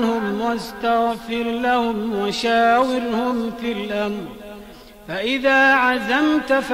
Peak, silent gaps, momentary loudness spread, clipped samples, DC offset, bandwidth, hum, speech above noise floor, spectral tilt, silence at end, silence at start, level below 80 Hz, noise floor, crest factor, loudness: -6 dBFS; none; 11 LU; under 0.1%; under 0.1%; 16 kHz; none; 22 dB; -4.5 dB/octave; 0 s; 0 s; -50 dBFS; -41 dBFS; 14 dB; -19 LUFS